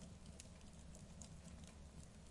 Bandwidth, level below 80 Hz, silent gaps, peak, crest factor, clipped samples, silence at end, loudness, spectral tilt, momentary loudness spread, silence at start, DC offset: 11.5 kHz; -62 dBFS; none; -36 dBFS; 22 dB; under 0.1%; 0 s; -59 LUFS; -4.5 dB/octave; 2 LU; 0 s; under 0.1%